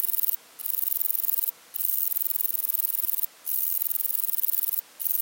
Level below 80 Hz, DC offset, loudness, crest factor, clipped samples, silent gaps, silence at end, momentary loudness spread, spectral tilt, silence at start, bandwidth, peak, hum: under -90 dBFS; under 0.1%; -24 LUFS; 20 dB; under 0.1%; none; 0 s; 4 LU; 2.5 dB/octave; 0 s; 17 kHz; -8 dBFS; none